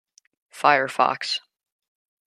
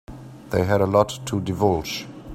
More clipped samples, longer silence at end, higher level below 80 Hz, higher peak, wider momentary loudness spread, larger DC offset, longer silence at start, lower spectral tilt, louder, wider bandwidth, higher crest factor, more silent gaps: neither; first, 0.9 s vs 0 s; second, -80 dBFS vs -46 dBFS; about the same, -2 dBFS vs -2 dBFS; second, 8 LU vs 14 LU; neither; first, 0.55 s vs 0.1 s; second, -2.5 dB/octave vs -6 dB/octave; about the same, -22 LUFS vs -22 LUFS; second, 13.5 kHz vs 16 kHz; about the same, 22 dB vs 22 dB; neither